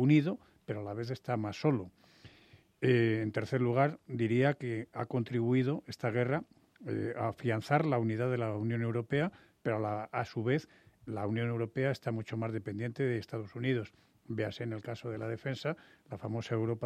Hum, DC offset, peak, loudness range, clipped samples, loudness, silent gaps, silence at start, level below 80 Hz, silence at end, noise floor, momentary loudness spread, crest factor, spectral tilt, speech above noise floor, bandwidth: none; under 0.1%; -12 dBFS; 5 LU; under 0.1%; -34 LUFS; none; 0 s; -72 dBFS; 0 s; -62 dBFS; 11 LU; 22 dB; -8 dB/octave; 29 dB; 9.2 kHz